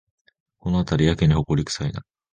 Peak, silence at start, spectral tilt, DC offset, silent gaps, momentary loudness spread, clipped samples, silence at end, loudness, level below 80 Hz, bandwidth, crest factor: -4 dBFS; 0.65 s; -6.5 dB/octave; under 0.1%; none; 13 LU; under 0.1%; 0.3 s; -22 LUFS; -36 dBFS; 9.6 kHz; 18 dB